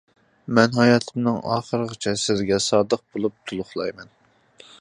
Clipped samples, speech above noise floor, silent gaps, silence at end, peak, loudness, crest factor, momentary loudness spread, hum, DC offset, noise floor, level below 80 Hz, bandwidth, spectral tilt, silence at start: under 0.1%; 31 dB; none; 0.75 s; 0 dBFS; -22 LUFS; 22 dB; 12 LU; none; under 0.1%; -52 dBFS; -58 dBFS; 11 kHz; -5 dB/octave; 0.5 s